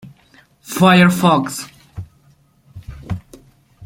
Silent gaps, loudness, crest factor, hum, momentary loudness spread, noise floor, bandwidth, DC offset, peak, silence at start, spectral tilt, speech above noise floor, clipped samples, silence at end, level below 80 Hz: none; -13 LUFS; 18 dB; none; 25 LU; -54 dBFS; 16.5 kHz; under 0.1%; -2 dBFS; 0.05 s; -5.5 dB/octave; 41 dB; under 0.1%; 0 s; -46 dBFS